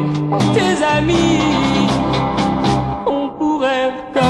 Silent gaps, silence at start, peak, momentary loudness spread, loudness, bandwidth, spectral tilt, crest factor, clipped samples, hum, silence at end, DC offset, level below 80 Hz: none; 0 s; -2 dBFS; 5 LU; -16 LUFS; 12 kHz; -6 dB/octave; 14 dB; under 0.1%; none; 0 s; under 0.1%; -36 dBFS